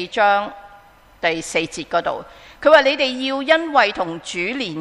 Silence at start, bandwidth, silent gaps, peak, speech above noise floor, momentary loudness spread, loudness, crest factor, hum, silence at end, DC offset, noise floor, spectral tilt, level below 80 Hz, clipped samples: 0 s; 12 kHz; none; 0 dBFS; 29 dB; 12 LU; -18 LUFS; 20 dB; none; 0 s; under 0.1%; -47 dBFS; -3 dB/octave; -54 dBFS; under 0.1%